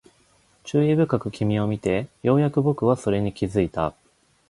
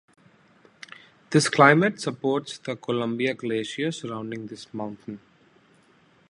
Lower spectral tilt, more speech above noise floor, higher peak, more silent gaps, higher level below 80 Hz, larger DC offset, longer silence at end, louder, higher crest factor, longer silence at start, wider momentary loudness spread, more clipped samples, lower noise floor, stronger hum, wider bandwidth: first, -8 dB/octave vs -5 dB/octave; about the same, 38 dB vs 35 dB; second, -6 dBFS vs -2 dBFS; neither; first, -48 dBFS vs -70 dBFS; neither; second, 0.6 s vs 1.1 s; about the same, -23 LUFS vs -24 LUFS; second, 18 dB vs 24 dB; second, 0.65 s vs 1.3 s; second, 6 LU vs 24 LU; neither; about the same, -60 dBFS vs -59 dBFS; neither; about the same, 11.5 kHz vs 11.5 kHz